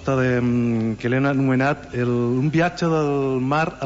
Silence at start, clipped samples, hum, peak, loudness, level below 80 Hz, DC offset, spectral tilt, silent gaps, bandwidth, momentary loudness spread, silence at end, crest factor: 0 s; under 0.1%; none; -8 dBFS; -21 LUFS; -48 dBFS; under 0.1%; -7.5 dB/octave; none; 8 kHz; 3 LU; 0 s; 12 dB